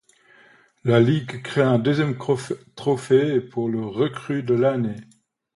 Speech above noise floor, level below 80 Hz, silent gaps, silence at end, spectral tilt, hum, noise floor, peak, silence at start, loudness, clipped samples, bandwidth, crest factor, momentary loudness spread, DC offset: 33 dB; -60 dBFS; none; 0.55 s; -7.5 dB/octave; none; -54 dBFS; -2 dBFS; 0.85 s; -22 LUFS; under 0.1%; 11.5 kHz; 20 dB; 9 LU; under 0.1%